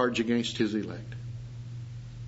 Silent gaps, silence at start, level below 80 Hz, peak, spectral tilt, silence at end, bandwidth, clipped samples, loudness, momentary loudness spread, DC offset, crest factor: none; 0 s; -54 dBFS; -12 dBFS; -5.5 dB/octave; 0 s; 8 kHz; under 0.1%; -32 LUFS; 14 LU; under 0.1%; 20 dB